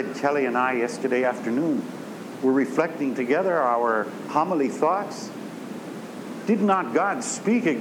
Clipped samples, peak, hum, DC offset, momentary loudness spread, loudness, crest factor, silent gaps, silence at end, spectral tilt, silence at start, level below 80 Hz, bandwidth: under 0.1%; -8 dBFS; none; under 0.1%; 14 LU; -24 LUFS; 16 dB; none; 0 s; -5.5 dB/octave; 0 s; -80 dBFS; 17.5 kHz